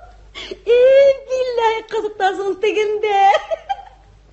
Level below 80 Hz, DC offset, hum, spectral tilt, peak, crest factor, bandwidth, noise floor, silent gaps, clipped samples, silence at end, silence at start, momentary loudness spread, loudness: -50 dBFS; under 0.1%; none; -3 dB/octave; -2 dBFS; 14 dB; 8.2 kHz; -44 dBFS; none; under 0.1%; 0.5 s; 0.35 s; 17 LU; -16 LUFS